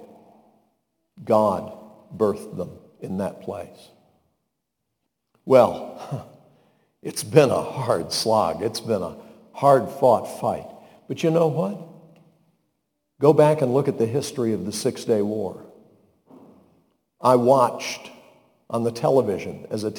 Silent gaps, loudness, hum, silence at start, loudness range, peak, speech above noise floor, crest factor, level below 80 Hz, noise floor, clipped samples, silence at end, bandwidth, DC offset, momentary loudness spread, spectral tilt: none; -22 LUFS; none; 0 s; 5 LU; 0 dBFS; 58 dB; 24 dB; -64 dBFS; -79 dBFS; under 0.1%; 0 s; 19 kHz; under 0.1%; 18 LU; -6 dB/octave